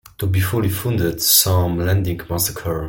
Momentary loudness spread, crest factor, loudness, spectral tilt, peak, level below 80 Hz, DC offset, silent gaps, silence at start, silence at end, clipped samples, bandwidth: 8 LU; 18 dB; -18 LUFS; -4 dB/octave; 0 dBFS; -40 dBFS; under 0.1%; none; 0.2 s; 0 s; under 0.1%; 17 kHz